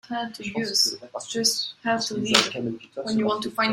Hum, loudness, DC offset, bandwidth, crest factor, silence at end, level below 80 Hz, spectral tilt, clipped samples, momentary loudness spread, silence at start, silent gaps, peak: none; -24 LUFS; under 0.1%; 16 kHz; 24 dB; 0 s; -64 dBFS; -2 dB/octave; under 0.1%; 11 LU; 0.1 s; none; -2 dBFS